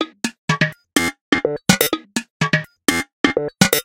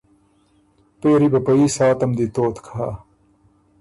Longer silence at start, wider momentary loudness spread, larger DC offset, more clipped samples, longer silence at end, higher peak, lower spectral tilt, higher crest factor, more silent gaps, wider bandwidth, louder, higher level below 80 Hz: second, 0 s vs 1.05 s; second, 7 LU vs 12 LU; neither; neither; second, 0 s vs 0.85 s; first, 0 dBFS vs -6 dBFS; second, -3.5 dB/octave vs -6.5 dB/octave; first, 20 dB vs 14 dB; first, 0.38-0.48 s, 1.21-1.32 s, 2.30-2.40 s, 3.13-3.24 s vs none; first, 17 kHz vs 11.5 kHz; about the same, -19 LUFS vs -18 LUFS; about the same, -50 dBFS vs -50 dBFS